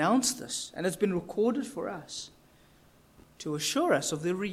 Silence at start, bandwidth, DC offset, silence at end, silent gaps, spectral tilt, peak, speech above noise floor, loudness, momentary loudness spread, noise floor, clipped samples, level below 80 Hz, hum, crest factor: 0 s; 16 kHz; under 0.1%; 0 s; none; -3.5 dB/octave; -14 dBFS; 30 dB; -30 LUFS; 13 LU; -60 dBFS; under 0.1%; -66 dBFS; none; 18 dB